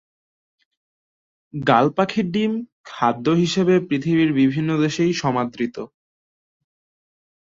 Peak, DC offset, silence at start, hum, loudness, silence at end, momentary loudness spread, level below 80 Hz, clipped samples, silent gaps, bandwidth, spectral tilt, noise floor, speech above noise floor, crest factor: -2 dBFS; under 0.1%; 1.55 s; none; -20 LUFS; 1.7 s; 11 LU; -60 dBFS; under 0.1%; 2.72-2.84 s; 7.6 kHz; -6.5 dB/octave; under -90 dBFS; over 71 dB; 20 dB